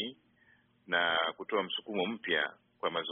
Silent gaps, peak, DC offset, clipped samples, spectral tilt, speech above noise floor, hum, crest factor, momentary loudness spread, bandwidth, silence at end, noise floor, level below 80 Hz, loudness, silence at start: none; -14 dBFS; under 0.1%; under 0.1%; 0 dB/octave; 34 dB; none; 20 dB; 8 LU; 4 kHz; 0 s; -67 dBFS; -78 dBFS; -33 LUFS; 0 s